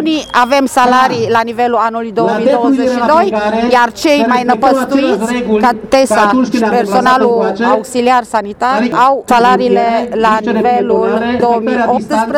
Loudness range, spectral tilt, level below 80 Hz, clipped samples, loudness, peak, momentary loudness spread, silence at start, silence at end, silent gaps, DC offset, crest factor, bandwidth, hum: 1 LU; -5 dB/octave; -46 dBFS; 0.2%; -11 LUFS; 0 dBFS; 4 LU; 0 s; 0 s; none; under 0.1%; 10 dB; 16.5 kHz; none